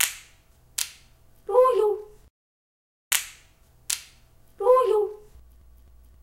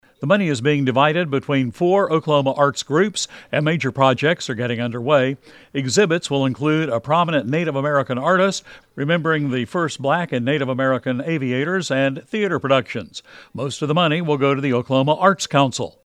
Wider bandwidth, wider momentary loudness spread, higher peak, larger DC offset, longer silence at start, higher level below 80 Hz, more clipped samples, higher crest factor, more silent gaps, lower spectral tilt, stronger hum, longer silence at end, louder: first, 16.5 kHz vs 12.5 kHz; first, 22 LU vs 7 LU; about the same, -2 dBFS vs -2 dBFS; neither; second, 0 s vs 0.2 s; about the same, -58 dBFS vs -62 dBFS; neither; first, 24 dB vs 18 dB; first, 2.30-3.11 s vs none; second, -1 dB/octave vs -5.5 dB/octave; neither; first, 1.05 s vs 0.15 s; second, -24 LUFS vs -19 LUFS